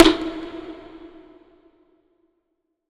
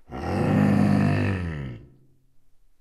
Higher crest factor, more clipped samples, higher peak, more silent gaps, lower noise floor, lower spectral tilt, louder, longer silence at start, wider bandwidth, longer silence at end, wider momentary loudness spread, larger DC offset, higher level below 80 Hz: first, 24 dB vs 16 dB; neither; first, 0 dBFS vs -10 dBFS; neither; first, -75 dBFS vs -56 dBFS; second, -4 dB/octave vs -8.5 dB/octave; about the same, -23 LUFS vs -23 LUFS; about the same, 0 s vs 0.1 s; about the same, 11.5 kHz vs 12 kHz; first, 2.15 s vs 1 s; first, 24 LU vs 16 LU; neither; about the same, -44 dBFS vs -46 dBFS